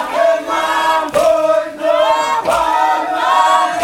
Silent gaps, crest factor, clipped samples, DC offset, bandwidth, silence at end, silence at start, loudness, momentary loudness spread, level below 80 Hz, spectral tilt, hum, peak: none; 12 dB; under 0.1%; under 0.1%; 17 kHz; 0 s; 0 s; -14 LUFS; 4 LU; -48 dBFS; -2 dB/octave; none; 0 dBFS